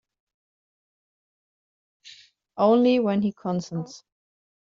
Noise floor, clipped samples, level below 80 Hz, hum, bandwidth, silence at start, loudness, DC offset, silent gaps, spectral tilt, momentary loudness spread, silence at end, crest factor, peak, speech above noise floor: -52 dBFS; under 0.1%; -70 dBFS; none; 7.6 kHz; 2.05 s; -23 LUFS; under 0.1%; none; -6.5 dB/octave; 17 LU; 0.7 s; 20 dB; -6 dBFS; 29 dB